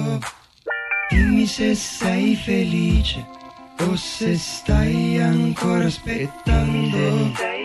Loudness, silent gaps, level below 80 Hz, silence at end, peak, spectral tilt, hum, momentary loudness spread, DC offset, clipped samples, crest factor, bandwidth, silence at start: -20 LUFS; none; -28 dBFS; 0 s; -6 dBFS; -5.5 dB/octave; none; 10 LU; under 0.1%; under 0.1%; 14 dB; 12.5 kHz; 0 s